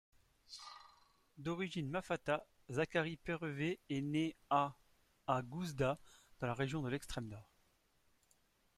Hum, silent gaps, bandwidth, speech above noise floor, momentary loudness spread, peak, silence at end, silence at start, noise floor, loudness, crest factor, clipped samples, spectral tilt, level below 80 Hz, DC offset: none; none; 14.5 kHz; 36 dB; 15 LU; -20 dBFS; 1.35 s; 0.5 s; -75 dBFS; -41 LUFS; 22 dB; under 0.1%; -6 dB/octave; -66 dBFS; under 0.1%